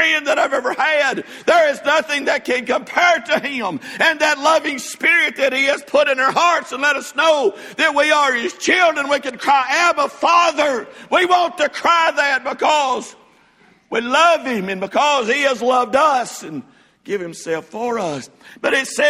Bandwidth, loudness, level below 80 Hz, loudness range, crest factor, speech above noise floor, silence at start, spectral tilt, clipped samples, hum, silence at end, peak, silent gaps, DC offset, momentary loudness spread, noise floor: 15.5 kHz; -16 LUFS; -64 dBFS; 3 LU; 16 dB; 36 dB; 0 s; -2 dB/octave; under 0.1%; none; 0 s; 0 dBFS; none; under 0.1%; 10 LU; -53 dBFS